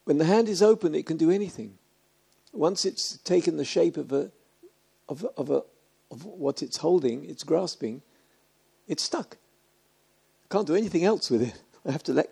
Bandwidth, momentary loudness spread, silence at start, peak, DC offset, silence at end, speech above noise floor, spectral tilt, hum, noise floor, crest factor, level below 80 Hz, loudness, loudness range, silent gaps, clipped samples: 13 kHz; 16 LU; 0.05 s; -8 dBFS; under 0.1%; 0.05 s; 41 dB; -5 dB/octave; none; -66 dBFS; 20 dB; -72 dBFS; -26 LUFS; 6 LU; none; under 0.1%